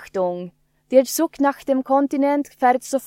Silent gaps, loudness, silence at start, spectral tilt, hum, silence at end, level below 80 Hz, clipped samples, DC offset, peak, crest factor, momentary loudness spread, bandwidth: none; -20 LUFS; 0 s; -4.5 dB/octave; none; 0 s; -64 dBFS; under 0.1%; under 0.1%; -2 dBFS; 18 dB; 7 LU; 16.5 kHz